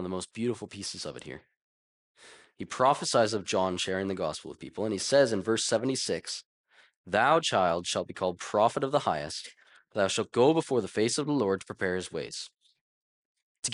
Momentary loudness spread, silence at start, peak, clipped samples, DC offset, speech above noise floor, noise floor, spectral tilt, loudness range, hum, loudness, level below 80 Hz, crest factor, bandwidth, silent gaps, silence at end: 15 LU; 0 s; -12 dBFS; under 0.1%; under 0.1%; over 61 dB; under -90 dBFS; -4 dB/octave; 3 LU; none; -29 LUFS; -70 dBFS; 18 dB; 11.5 kHz; 1.57-2.15 s, 6.45-6.64 s, 6.97-7.04 s, 12.81-13.35 s, 13.43-13.63 s; 0 s